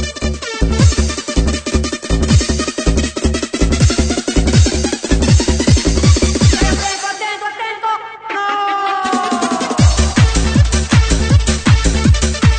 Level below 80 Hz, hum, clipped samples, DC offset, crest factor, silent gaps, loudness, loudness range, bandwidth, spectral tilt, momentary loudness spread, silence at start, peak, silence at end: -18 dBFS; none; under 0.1%; under 0.1%; 14 dB; none; -14 LUFS; 3 LU; 9.4 kHz; -5 dB/octave; 7 LU; 0 s; 0 dBFS; 0 s